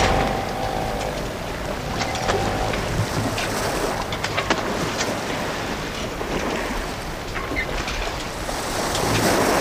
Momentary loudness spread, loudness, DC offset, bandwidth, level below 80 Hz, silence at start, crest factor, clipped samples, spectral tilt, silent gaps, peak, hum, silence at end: 7 LU; -24 LUFS; under 0.1%; 16 kHz; -34 dBFS; 0 s; 18 dB; under 0.1%; -4 dB/octave; none; -6 dBFS; none; 0 s